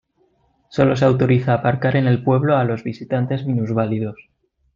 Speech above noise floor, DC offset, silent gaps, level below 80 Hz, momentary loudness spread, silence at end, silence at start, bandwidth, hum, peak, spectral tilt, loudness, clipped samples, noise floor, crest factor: 44 dB; under 0.1%; none; -54 dBFS; 9 LU; 0.6 s; 0.7 s; 7.2 kHz; none; -2 dBFS; -8.5 dB/octave; -19 LUFS; under 0.1%; -62 dBFS; 16 dB